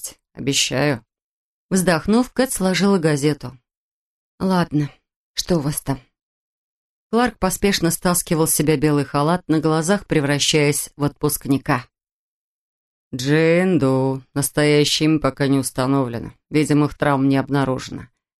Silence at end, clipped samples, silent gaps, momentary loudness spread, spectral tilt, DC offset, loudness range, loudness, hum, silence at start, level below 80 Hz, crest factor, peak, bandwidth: 0.35 s; under 0.1%; 1.22-1.69 s, 3.77-4.38 s, 5.16-5.34 s, 6.22-7.10 s, 12.12-13.11 s; 10 LU; -4.5 dB/octave; under 0.1%; 5 LU; -19 LUFS; none; 0 s; -46 dBFS; 18 dB; -2 dBFS; 13 kHz